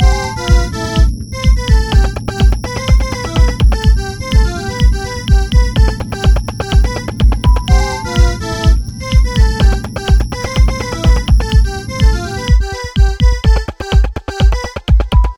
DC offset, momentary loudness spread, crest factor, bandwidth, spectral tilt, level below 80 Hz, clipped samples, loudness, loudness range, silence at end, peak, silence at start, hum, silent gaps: under 0.1%; 5 LU; 10 dB; 12 kHz; -5.5 dB/octave; -12 dBFS; 0.1%; -14 LUFS; 1 LU; 0 s; 0 dBFS; 0 s; none; none